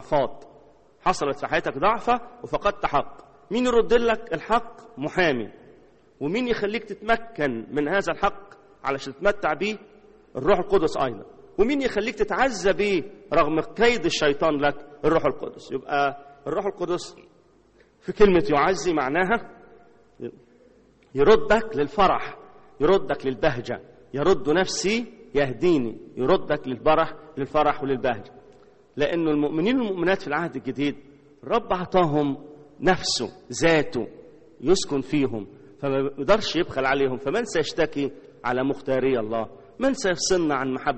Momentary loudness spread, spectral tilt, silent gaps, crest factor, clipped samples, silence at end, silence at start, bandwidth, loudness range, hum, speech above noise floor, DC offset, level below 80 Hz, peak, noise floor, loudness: 12 LU; -4.5 dB/octave; none; 20 dB; under 0.1%; 0 s; 0 s; 8.4 kHz; 3 LU; none; 35 dB; under 0.1%; -46 dBFS; -4 dBFS; -58 dBFS; -24 LUFS